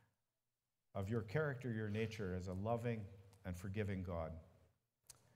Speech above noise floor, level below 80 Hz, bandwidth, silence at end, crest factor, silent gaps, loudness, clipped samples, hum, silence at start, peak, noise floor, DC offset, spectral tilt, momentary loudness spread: over 47 dB; -66 dBFS; 15.5 kHz; 0.25 s; 20 dB; none; -44 LUFS; under 0.1%; none; 0.95 s; -26 dBFS; under -90 dBFS; under 0.1%; -7.5 dB/octave; 13 LU